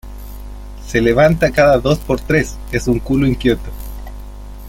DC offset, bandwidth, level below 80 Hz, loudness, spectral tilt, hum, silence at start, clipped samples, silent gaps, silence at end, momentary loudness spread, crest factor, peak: under 0.1%; 17 kHz; -28 dBFS; -15 LUFS; -6.5 dB/octave; 50 Hz at -30 dBFS; 0.05 s; under 0.1%; none; 0 s; 22 LU; 14 dB; -2 dBFS